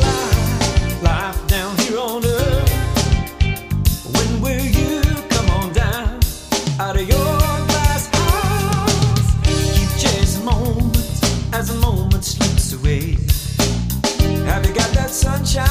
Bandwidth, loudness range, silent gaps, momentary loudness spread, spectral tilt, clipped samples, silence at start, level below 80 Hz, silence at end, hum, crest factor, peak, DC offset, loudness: 15.5 kHz; 2 LU; none; 3 LU; -4.5 dB/octave; under 0.1%; 0 s; -22 dBFS; 0 s; none; 16 dB; -2 dBFS; under 0.1%; -18 LUFS